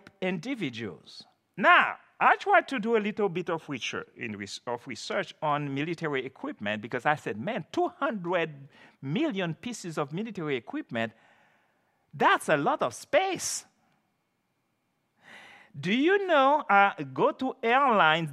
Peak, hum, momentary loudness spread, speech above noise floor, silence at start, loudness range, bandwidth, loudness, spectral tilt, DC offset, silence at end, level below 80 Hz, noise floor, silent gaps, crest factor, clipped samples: -6 dBFS; none; 14 LU; 49 dB; 0.2 s; 7 LU; 14.5 kHz; -27 LUFS; -4.5 dB/octave; under 0.1%; 0 s; -80 dBFS; -76 dBFS; none; 22 dB; under 0.1%